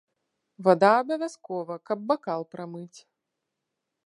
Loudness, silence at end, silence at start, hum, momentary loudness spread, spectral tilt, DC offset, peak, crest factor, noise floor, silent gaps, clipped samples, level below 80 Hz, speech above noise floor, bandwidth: -25 LUFS; 1.1 s; 0.6 s; none; 19 LU; -6 dB/octave; under 0.1%; -4 dBFS; 22 dB; -83 dBFS; none; under 0.1%; -80 dBFS; 58 dB; 11 kHz